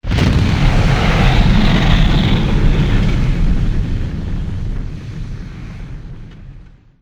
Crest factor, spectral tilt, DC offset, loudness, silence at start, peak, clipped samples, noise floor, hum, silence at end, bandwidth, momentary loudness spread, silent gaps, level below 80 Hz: 14 dB; -6.5 dB/octave; under 0.1%; -15 LUFS; 0.05 s; 0 dBFS; under 0.1%; -39 dBFS; none; 0.35 s; 8.8 kHz; 18 LU; none; -16 dBFS